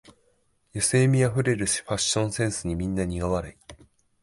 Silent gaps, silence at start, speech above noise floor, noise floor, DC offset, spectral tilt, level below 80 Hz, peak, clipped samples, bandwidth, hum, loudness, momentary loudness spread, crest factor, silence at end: none; 0.75 s; 42 dB; -67 dBFS; under 0.1%; -4.5 dB/octave; -44 dBFS; -10 dBFS; under 0.1%; 11.5 kHz; none; -25 LUFS; 8 LU; 16 dB; 0.5 s